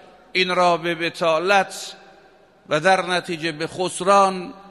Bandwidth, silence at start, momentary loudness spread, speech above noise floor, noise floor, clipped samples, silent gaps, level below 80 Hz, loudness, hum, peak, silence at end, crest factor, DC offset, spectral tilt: 14 kHz; 0.35 s; 10 LU; 32 dB; -52 dBFS; under 0.1%; none; -64 dBFS; -20 LUFS; none; -2 dBFS; 0 s; 20 dB; under 0.1%; -3.5 dB/octave